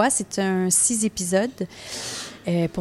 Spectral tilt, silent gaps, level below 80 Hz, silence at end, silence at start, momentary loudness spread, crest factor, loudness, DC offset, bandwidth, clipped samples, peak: -3.5 dB/octave; none; -56 dBFS; 0 s; 0 s; 13 LU; 16 dB; -23 LUFS; under 0.1%; 15 kHz; under 0.1%; -6 dBFS